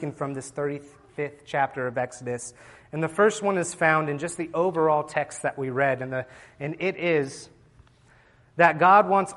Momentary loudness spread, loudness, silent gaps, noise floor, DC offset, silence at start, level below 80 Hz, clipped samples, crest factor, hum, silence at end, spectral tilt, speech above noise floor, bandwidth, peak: 16 LU; -25 LUFS; none; -57 dBFS; under 0.1%; 0 s; -64 dBFS; under 0.1%; 22 dB; none; 0 s; -5 dB/octave; 33 dB; 11.5 kHz; -4 dBFS